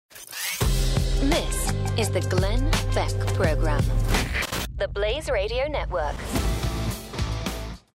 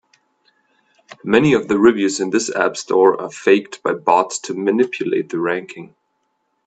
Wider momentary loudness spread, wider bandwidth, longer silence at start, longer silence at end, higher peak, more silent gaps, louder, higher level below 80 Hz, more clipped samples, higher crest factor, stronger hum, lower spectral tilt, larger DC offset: second, 6 LU vs 9 LU; first, 16 kHz vs 9.2 kHz; second, 0.15 s vs 1.25 s; second, 0.15 s vs 0.8 s; second, -10 dBFS vs 0 dBFS; neither; second, -26 LUFS vs -17 LUFS; first, -28 dBFS vs -58 dBFS; neither; about the same, 14 dB vs 18 dB; neither; about the same, -4.5 dB/octave vs -4.5 dB/octave; neither